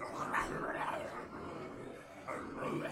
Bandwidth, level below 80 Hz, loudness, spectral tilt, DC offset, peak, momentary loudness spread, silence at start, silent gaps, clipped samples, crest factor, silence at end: 16 kHz; -64 dBFS; -41 LUFS; -5 dB/octave; under 0.1%; -20 dBFS; 11 LU; 0 s; none; under 0.1%; 20 dB; 0 s